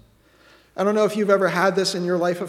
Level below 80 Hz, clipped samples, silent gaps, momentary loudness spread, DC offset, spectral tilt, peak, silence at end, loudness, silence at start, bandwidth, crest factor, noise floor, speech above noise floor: -66 dBFS; under 0.1%; none; 5 LU; under 0.1%; -5 dB/octave; -4 dBFS; 0 s; -20 LUFS; 0.75 s; 15.5 kHz; 18 dB; -54 dBFS; 34 dB